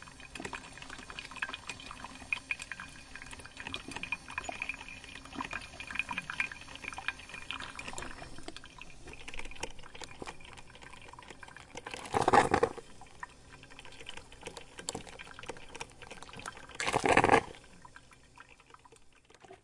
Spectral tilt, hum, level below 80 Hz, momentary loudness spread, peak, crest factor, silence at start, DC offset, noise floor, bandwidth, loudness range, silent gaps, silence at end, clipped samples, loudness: -3.5 dB/octave; none; -56 dBFS; 21 LU; -6 dBFS; 32 dB; 0 s; under 0.1%; -59 dBFS; 11.5 kHz; 13 LU; none; 0.05 s; under 0.1%; -36 LUFS